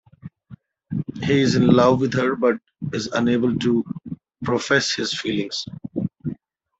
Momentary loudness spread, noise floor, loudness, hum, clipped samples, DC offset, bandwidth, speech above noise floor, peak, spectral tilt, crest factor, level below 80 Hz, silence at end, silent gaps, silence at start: 16 LU; -47 dBFS; -21 LUFS; none; under 0.1%; under 0.1%; 8 kHz; 27 dB; -2 dBFS; -5.5 dB/octave; 20 dB; -56 dBFS; 0.45 s; none; 0.25 s